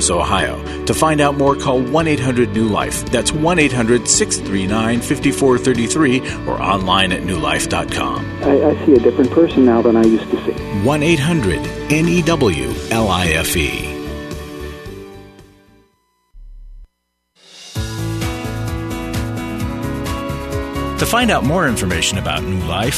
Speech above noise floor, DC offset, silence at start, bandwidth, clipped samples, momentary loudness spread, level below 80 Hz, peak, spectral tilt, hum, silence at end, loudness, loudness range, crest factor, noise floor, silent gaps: 53 dB; under 0.1%; 0 s; 13.5 kHz; under 0.1%; 11 LU; -32 dBFS; 0 dBFS; -4.5 dB/octave; none; 0 s; -16 LUFS; 13 LU; 16 dB; -68 dBFS; none